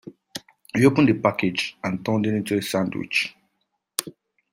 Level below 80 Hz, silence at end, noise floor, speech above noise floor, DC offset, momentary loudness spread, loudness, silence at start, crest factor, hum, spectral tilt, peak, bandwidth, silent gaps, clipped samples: -60 dBFS; 0.4 s; -75 dBFS; 54 dB; under 0.1%; 15 LU; -23 LUFS; 0.05 s; 22 dB; none; -5 dB/octave; -2 dBFS; 16 kHz; none; under 0.1%